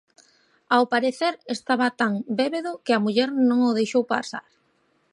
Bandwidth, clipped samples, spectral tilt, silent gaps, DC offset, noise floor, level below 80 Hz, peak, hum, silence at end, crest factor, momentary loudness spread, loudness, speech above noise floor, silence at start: 10.5 kHz; under 0.1%; -5 dB/octave; none; under 0.1%; -66 dBFS; -76 dBFS; -6 dBFS; none; 0.75 s; 18 dB; 8 LU; -23 LUFS; 44 dB; 0.7 s